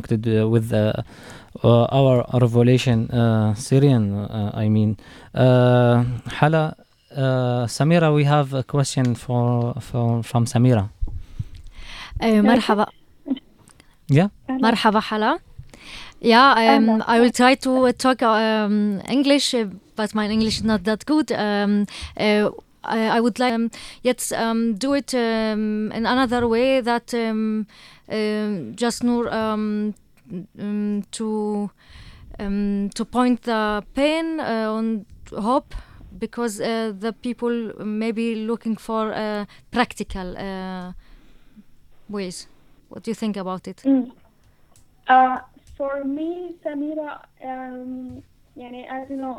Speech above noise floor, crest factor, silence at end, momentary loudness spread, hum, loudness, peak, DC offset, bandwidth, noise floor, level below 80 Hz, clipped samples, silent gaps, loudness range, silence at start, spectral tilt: 34 dB; 20 dB; 0 s; 16 LU; none; -21 LUFS; -2 dBFS; under 0.1%; 14 kHz; -54 dBFS; -46 dBFS; under 0.1%; none; 10 LU; 0 s; -6 dB/octave